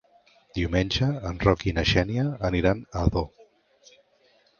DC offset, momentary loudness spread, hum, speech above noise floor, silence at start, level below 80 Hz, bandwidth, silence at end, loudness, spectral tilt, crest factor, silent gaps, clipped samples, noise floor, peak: under 0.1%; 8 LU; none; 38 dB; 0.55 s; -38 dBFS; 7 kHz; 1.35 s; -25 LUFS; -6.5 dB/octave; 24 dB; none; under 0.1%; -63 dBFS; -4 dBFS